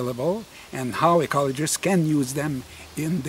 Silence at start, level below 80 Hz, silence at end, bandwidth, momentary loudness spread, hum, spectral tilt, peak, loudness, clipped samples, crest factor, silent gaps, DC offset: 0 s; -54 dBFS; 0 s; 16 kHz; 12 LU; none; -5 dB/octave; -6 dBFS; -24 LUFS; under 0.1%; 18 dB; none; under 0.1%